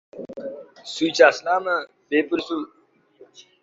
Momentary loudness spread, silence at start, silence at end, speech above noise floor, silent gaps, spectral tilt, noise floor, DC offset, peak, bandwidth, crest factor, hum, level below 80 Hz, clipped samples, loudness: 21 LU; 0.15 s; 0.2 s; 31 dB; none; -3 dB/octave; -53 dBFS; under 0.1%; -2 dBFS; 8 kHz; 22 dB; none; -70 dBFS; under 0.1%; -21 LUFS